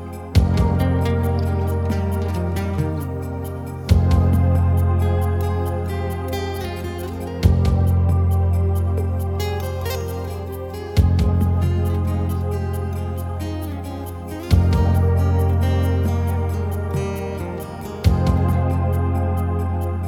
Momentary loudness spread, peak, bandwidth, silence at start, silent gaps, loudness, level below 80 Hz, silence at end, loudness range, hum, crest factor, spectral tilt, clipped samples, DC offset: 11 LU; -2 dBFS; 15.5 kHz; 0 s; none; -21 LUFS; -28 dBFS; 0 s; 2 LU; none; 18 dB; -8 dB/octave; under 0.1%; under 0.1%